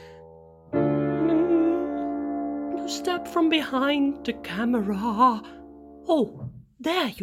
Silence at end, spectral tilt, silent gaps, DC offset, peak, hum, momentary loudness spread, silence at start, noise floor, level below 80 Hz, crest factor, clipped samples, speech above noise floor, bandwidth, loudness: 0 s; -5.5 dB/octave; none; under 0.1%; -8 dBFS; none; 11 LU; 0 s; -49 dBFS; -56 dBFS; 18 dB; under 0.1%; 24 dB; 15.5 kHz; -25 LUFS